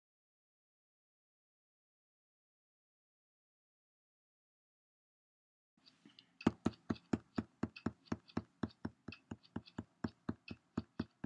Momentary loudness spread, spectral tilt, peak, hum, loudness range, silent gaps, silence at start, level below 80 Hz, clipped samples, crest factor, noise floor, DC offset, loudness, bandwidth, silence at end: 14 LU; -7 dB/octave; -16 dBFS; none; 4 LU; none; 6.05 s; -72 dBFS; under 0.1%; 32 dB; -67 dBFS; under 0.1%; -45 LUFS; 9.6 kHz; 0.2 s